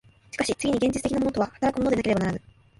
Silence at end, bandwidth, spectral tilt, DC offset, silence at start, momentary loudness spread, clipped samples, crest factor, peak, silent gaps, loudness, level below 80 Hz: 0.4 s; 11.5 kHz; -5.5 dB/octave; under 0.1%; 0.35 s; 6 LU; under 0.1%; 16 dB; -10 dBFS; none; -25 LUFS; -48 dBFS